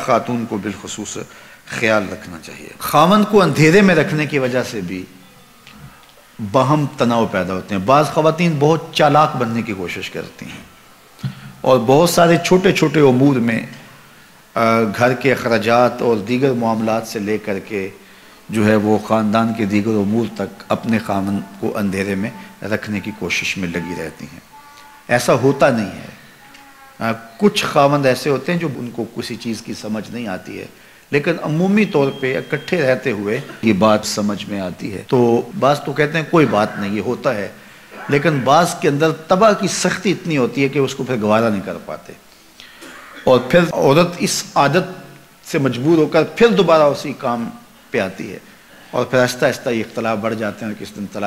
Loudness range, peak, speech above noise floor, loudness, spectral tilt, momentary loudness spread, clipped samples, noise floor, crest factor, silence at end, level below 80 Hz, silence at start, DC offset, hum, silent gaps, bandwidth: 6 LU; -2 dBFS; 29 dB; -17 LUFS; -5.5 dB/octave; 15 LU; under 0.1%; -45 dBFS; 16 dB; 0 s; -52 dBFS; 0 s; 0.1%; none; none; 16 kHz